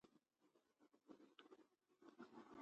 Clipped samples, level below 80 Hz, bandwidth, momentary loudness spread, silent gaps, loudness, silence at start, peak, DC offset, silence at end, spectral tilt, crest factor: under 0.1%; under -90 dBFS; 8.2 kHz; 6 LU; none; -66 LUFS; 0.05 s; -44 dBFS; under 0.1%; 0 s; -5 dB/octave; 22 dB